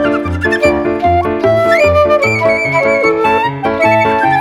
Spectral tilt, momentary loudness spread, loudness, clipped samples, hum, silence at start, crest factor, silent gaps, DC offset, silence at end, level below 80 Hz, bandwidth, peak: -6 dB/octave; 4 LU; -11 LUFS; under 0.1%; none; 0 s; 10 dB; none; under 0.1%; 0 s; -34 dBFS; 13.5 kHz; 0 dBFS